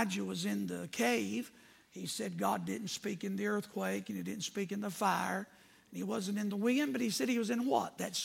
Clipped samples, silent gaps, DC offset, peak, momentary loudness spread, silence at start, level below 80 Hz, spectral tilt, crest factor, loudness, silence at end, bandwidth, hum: under 0.1%; none; under 0.1%; -18 dBFS; 9 LU; 0 s; -80 dBFS; -4 dB/octave; 18 dB; -36 LUFS; 0 s; 16.5 kHz; none